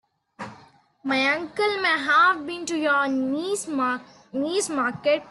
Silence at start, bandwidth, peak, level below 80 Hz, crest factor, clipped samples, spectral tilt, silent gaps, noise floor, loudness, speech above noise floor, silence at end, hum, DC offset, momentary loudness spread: 0.4 s; 12.5 kHz; -8 dBFS; -70 dBFS; 16 dB; under 0.1%; -2.5 dB/octave; none; -54 dBFS; -23 LUFS; 30 dB; 0 s; none; under 0.1%; 16 LU